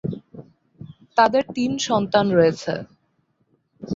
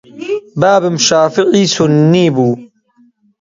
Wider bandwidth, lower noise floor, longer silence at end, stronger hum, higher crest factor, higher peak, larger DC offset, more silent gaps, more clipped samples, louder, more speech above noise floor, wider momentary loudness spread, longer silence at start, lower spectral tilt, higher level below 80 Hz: about the same, 7.8 kHz vs 7.8 kHz; first, -67 dBFS vs -51 dBFS; second, 0 s vs 0.75 s; neither; first, 20 dB vs 12 dB; about the same, -2 dBFS vs 0 dBFS; neither; neither; neither; second, -20 LUFS vs -11 LUFS; first, 48 dB vs 41 dB; first, 14 LU vs 11 LU; about the same, 0.05 s vs 0.15 s; about the same, -5 dB/octave vs -5 dB/octave; about the same, -58 dBFS vs -54 dBFS